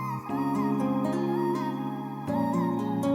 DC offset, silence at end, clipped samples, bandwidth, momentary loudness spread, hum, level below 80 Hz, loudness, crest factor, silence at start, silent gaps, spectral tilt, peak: under 0.1%; 0 s; under 0.1%; 16 kHz; 5 LU; none; -68 dBFS; -29 LUFS; 12 dB; 0 s; none; -8 dB/octave; -16 dBFS